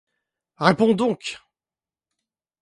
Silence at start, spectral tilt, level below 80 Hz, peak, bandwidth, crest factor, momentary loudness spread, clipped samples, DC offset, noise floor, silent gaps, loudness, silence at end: 0.6 s; -6 dB/octave; -64 dBFS; 0 dBFS; 11.5 kHz; 24 dB; 15 LU; under 0.1%; under 0.1%; under -90 dBFS; none; -21 LUFS; 1.25 s